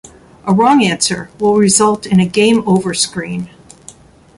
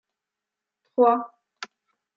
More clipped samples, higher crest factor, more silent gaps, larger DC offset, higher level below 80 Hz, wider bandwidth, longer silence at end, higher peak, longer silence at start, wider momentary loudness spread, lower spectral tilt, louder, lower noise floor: neither; second, 14 dB vs 20 dB; neither; neither; first, -48 dBFS vs -86 dBFS; first, 11.5 kHz vs 7.4 kHz; first, 0.9 s vs 0.5 s; first, 0 dBFS vs -6 dBFS; second, 0.45 s vs 1 s; second, 13 LU vs 21 LU; first, -4.5 dB/octave vs -2.5 dB/octave; first, -13 LUFS vs -22 LUFS; second, -40 dBFS vs -87 dBFS